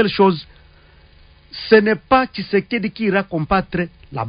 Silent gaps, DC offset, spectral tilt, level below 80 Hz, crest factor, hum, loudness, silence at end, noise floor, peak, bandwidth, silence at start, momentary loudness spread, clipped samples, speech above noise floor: none; under 0.1%; -11 dB/octave; -44 dBFS; 18 dB; none; -18 LUFS; 0 s; -48 dBFS; 0 dBFS; 5.2 kHz; 0 s; 13 LU; under 0.1%; 31 dB